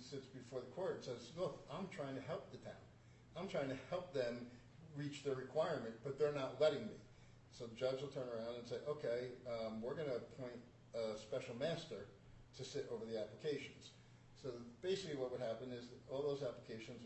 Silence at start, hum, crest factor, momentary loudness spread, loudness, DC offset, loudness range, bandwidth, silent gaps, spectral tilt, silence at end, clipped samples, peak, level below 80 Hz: 0 s; none; 22 dB; 16 LU; -46 LUFS; under 0.1%; 5 LU; 8.2 kHz; none; -5.5 dB/octave; 0 s; under 0.1%; -24 dBFS; -74 dBFS